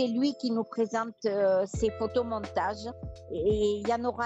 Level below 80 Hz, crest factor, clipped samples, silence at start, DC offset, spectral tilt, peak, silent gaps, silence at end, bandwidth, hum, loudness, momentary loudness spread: -50 dBFS; 14 dB; under 0.1%; 0 s; under 0.1%; -6 dB/octave; -16 dBFS; none; 0 s; 8.2 kHz; none; -30 LUFS; 8 LU